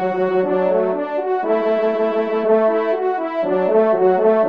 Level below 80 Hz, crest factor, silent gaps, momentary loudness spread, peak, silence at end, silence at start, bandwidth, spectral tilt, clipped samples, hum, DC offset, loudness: -68 dBFS; 12 dB; none; 6 LU; -4 dBFS; 0 s; 0 s; 5.4 kHz; -8.5 dB/octave; under 0.1%; none; 0.3%; -18 LUFS